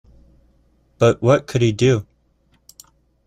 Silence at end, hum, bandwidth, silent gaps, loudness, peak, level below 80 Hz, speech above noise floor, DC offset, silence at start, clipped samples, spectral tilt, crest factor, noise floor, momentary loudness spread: 1.25 s; none; 14 kHz; none; -17 LUFS; -2 dBFS; -50 dBFS; 45 dB; under 0.1%; 1 s; under 0.1%; -6.5 dB/octave; 18 dB; -60 dBFS; 4 LU